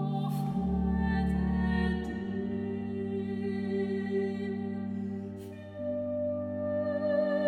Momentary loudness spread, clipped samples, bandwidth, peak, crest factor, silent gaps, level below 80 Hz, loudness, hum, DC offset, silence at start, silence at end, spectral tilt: 7 LU; under 0.1%; 13 kHz; -18 dBFS; 14 dB; none; -44 dBFS; -32 LUFS; none; under 0.1%; 0 s; 0 s; -9 dB/octave